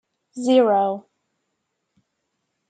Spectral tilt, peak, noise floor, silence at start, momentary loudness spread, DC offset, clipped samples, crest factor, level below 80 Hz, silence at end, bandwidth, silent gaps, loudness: -5.5 dB/octave; -4 dBFS; -76 dBFS; 0.35 s; 18 LU; under 0.1%; under 0.1%; 18 dB; -80 dBFS; 1.7 s; 9.2 kHz; none; -19 LUFS